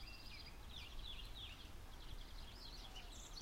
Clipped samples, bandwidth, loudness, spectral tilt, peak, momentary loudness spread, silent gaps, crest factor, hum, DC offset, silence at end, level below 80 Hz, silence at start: under 0.1%; 16 kHz; -54 LUFS; -3 dB/octave; -38 dBFS; 5 LU; none; 14 dB; none; under 0.1%; 0 s; -54 dBFS; 0 s